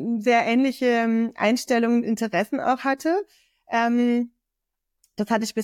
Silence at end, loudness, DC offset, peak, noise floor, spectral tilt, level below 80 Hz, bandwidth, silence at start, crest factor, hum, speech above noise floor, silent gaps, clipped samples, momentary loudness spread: 0 s; -22 LUFS; under 0.1%; -8 dBFS; -83 dBFS; -5 dB/octave; -68 dBFS; 15 kHz; 0 s; 14 dB; none; 61 dB; none; under 0.1%; 7 LU